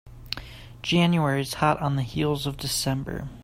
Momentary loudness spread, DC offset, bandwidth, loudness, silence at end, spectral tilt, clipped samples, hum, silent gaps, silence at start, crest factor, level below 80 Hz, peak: 14 LU; under 0.1%; 16 kHz; -26 LUFS; 0 s; -5 dB/octave; under 0.1%; none; none; 0.05 s; 18 dB; -46 dBFS; -8 dBFS